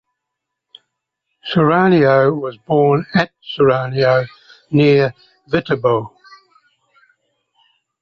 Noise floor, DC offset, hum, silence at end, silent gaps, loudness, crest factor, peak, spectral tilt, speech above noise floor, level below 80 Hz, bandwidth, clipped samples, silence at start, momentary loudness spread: -79 dBFS; under 0.1%; none; 1.95 s; none; -15 LUFS; 16 dB; -2 dBFS; -8.5 dB/octave; 65 dB; -54 dBFS; 6.6 kHz; under 0.1%; 1.45 s; 10 LU